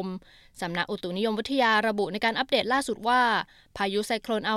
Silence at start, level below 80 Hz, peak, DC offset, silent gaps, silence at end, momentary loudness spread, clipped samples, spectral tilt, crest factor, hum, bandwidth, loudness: 0 s; -60 dBFS; -10 dBFS; under 0.1%; none; 0 s; 10 LU; under 0.1%; -4 dB/octave; 16 dB; none; 15 kHz; -26 LUFS